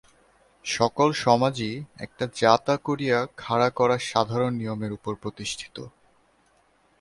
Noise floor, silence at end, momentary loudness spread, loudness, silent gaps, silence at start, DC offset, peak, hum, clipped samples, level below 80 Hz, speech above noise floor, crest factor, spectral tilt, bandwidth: -63 dBFS; 1.1 s; 15 LU; -25 LUFS; none; 0.65 s; under 0.1%; -2 dBFS; none; under 0.1%; -60 dBFS; 39 dB; 24 dB; -5 dB/octave; 11.5 kHz